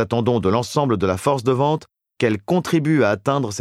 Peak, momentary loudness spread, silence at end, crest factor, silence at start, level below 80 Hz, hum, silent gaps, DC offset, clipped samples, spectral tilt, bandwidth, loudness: -4 dBFS; 4 LU; 0 s; 16 dB; 0 s; -52 dBFS; none; none; under 0.1%; under 0.1%; -6.5 dB/octave; 15 kHz; -20 LUFS